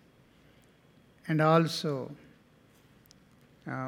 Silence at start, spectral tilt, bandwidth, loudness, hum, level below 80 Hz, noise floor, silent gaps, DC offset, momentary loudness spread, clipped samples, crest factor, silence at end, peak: 1.25 s; -6.5 dB/octave; 15 kHz; -28 LUFS; none; -74 dBFS; -61 dBFS; none; under 0.1%; 23 LU; under 0.1%; 24 dB; 0 s; -10 dBFS